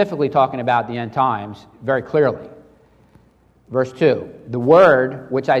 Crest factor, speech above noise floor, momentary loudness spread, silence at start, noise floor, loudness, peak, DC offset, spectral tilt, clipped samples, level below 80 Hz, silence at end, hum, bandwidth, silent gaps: 16 dB; 37 dB; 15 LU; 0 s; -54 dBFS; -17 LUFS; -2 dBFS; under 0.1%; -7.5 dB/octave; under 0.1%; -58 dBFS; 0 s; none; 8.4 kHz; none